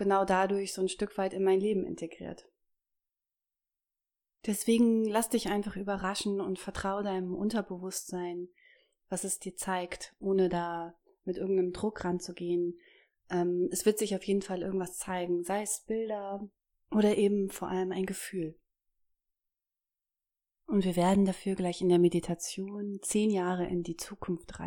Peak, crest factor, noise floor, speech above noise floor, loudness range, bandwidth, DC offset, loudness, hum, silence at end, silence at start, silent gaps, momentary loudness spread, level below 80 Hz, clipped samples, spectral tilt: -14 dBFS; 18 dB; under -90 dBFS; over 59 dB; 5 LU; 19 kHz; under 0.1%; -32 LUFS; none; 0 s; 0 s; none; 13 LU; -60 dBFS; under 0.1%; -5 dB/octave